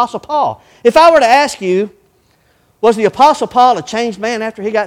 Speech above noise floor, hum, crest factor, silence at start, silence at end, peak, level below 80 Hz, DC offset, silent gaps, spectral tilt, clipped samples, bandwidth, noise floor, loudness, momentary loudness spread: 43 dB; none; 12 dB; 0 s; 0 s; 0 dBFS; -50 dBFS; under 0.1%; none; -4 dB/octave; 0.4%; 15.5 kHz; -54 dBFS; -12 LUFS; 11 LU